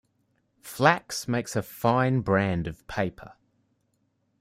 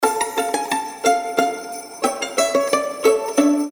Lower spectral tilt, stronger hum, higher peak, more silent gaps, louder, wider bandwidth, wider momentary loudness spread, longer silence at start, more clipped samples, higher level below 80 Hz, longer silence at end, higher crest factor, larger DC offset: first, -5.5 dB/octave vs -2 dB/octave; neither; about the same, -4 dBFS vs -2 dBFS; neither; second, -26 LUFS vs -20 LUFS; second, 16 kHz vs 19 kHz; first, 10 LU vs 6 LU; first, 0.65 s vs 0 s; neither; first, -56 dBFS vs -66 dBFS; first, 1.1 s vs 0 s; first, 24 dB vs 18 dB; neither